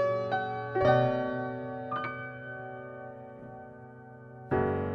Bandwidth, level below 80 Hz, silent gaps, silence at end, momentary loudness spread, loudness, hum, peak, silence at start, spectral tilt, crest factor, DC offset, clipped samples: 6.2 kHz; -58 dBFS; none; 0 s; 22 LU; -31 LUFS; none; -12 dBFS; 0 s; -8.5 dB/octave; 20 dB; under 0.1%; under 0.1%